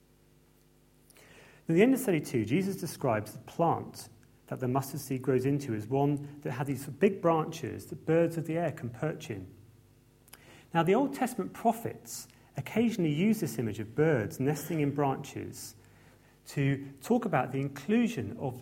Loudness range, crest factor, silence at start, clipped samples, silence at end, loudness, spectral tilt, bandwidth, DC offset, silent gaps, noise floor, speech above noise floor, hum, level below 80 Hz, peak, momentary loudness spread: 3 LU; 22 dB; 1.3 s; under 0.1%; 0 s; -31 LUFS; -6.5 dB/octave; 16.5 kHz; under 0.1%; none; -63 dBFS; 33 dB; none; -66 dBFS; -10 dBFS; 14 LU